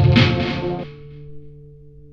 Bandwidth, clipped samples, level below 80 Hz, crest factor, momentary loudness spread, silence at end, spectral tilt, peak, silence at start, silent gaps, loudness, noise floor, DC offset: 7.2 kHz; under 0.1%; -36 dBFS; 18 dB; 25 LU; 0.6 s; -7.5 dB/octave; -2 dBFS; 0 s; none; -19 LUFS; -42 dBFS; under 0.1%